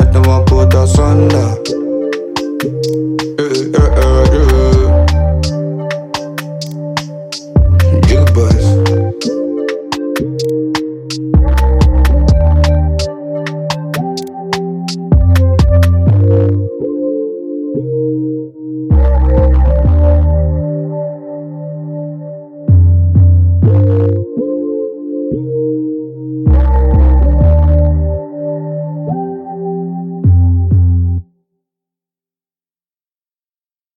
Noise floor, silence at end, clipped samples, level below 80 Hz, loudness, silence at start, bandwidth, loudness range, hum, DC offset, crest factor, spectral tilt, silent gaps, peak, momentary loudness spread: under -90 dBFS; 2.75 s; under 0.1%; -16 dBFS; -13 LUFS; 0 s; 14 kHz; 3 LU; none; under 0.1%; 10 dB; -7.5 dB/octave; none; 0 dBFS; 12 LU